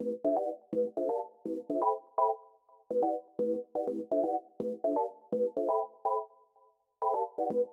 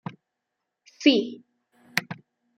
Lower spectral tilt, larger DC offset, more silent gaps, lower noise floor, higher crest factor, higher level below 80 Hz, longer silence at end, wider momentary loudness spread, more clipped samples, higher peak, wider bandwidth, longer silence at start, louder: first, -9 dB/octave vs -4 dB/octave; neither; neither; second, -67 dBFS vs -83 dBFS; second, 16 dB vs 24 dB; about the same, -82 dBFS vs -80 dBFS; second, 0 s vs 0.45 s; second, 5 LU vs 22 LU; neither; second, -16 dBFS vs -4 dBFS; second, 3.2 kHz vs 16 kHz; second, 0 s vs 1 s; second, -33 LUFS vs -24 LUFS